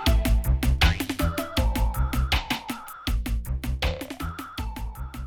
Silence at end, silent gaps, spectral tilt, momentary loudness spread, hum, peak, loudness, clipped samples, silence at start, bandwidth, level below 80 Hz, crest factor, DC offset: 0 s; none; -5 dB/octave; 12 LU; none; -10 dBFS; -27 LUFS; under 0.1%; 0 s; 18 kHz; -26 dBFS; 16 dB; under 0.1%